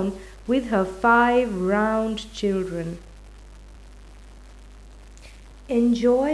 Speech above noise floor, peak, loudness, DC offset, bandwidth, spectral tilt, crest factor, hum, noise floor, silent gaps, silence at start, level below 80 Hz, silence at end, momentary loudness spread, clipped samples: 23 dB; -6 dBFS; -22 LUFS; under 0.1%; 11 kHz; -6 dB/octave; 18 dB; 50 Hz at -45 dBFS; -44 dBFS; none; 0 s; -44 dBFS; 0 s; 13 LU; under 0.1%